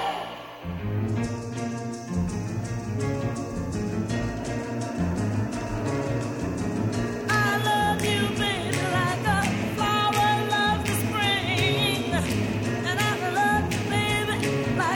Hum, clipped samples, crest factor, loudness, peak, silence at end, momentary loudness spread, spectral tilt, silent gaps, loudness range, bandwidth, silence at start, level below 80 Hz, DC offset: none; under 0.1%; 16 dB; -26 LUFS; -10 dBFS; 0 s; 8 LU; -5 dB/octave; none; 6 LU; 16.5 kHz; 0 s; -44 dBFS; under 0.1%